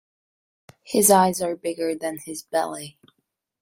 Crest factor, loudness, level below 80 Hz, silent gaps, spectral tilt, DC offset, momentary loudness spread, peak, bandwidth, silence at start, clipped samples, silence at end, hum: 22 dB; -22 LUFS; -66 dBFS; none; -3.5 dB/octave; under 0.1%; 17 LU; -4 dBFS; 16 kHz; 0.85 s; under 0.1%; 0.7 s; none